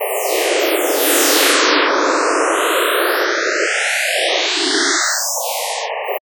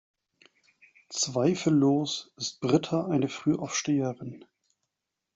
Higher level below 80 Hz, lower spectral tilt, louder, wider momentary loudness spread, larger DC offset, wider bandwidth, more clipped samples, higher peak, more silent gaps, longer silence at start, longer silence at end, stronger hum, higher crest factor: second, -84 dBFS vs -68 dBFS; second, 2 dB/octave vs -5 dB/octave; first, -15 LUFS vs -27 LUFS; second, 8 LU vs 11 LU; neither; first, over 20 kHz vs 8 kHz; neither; first, 0 dBFS vs -8 dBFS; neither; second, 0 s vs 1.1 s; second, 0.15 s vs 1 s; neither; about the same, 16 dB vs 20 dB